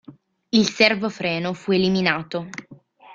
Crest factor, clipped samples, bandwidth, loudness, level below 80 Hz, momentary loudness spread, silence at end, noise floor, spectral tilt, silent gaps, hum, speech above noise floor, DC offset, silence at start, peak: 22 dB; under 0.1%; 7.6 kHz; -21 LUFS; -60 dBFS; 13 LU; 0 s; -48 dBFS; -5 dB/octave; none; none; 27 dB; under 0.1%; 0.1 s; -2 dBFS